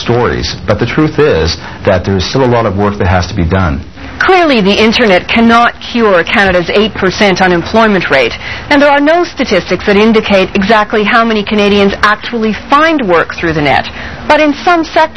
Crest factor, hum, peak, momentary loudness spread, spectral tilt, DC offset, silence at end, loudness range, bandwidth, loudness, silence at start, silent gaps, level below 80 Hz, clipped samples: 10 dB; none; 0 dBFS; 6 LU; -5.5 dB/octave; 2%; 0 s; 3 LU; 11 kHz; -9 LUFS; 0 s; none; -30 dBFS; 1%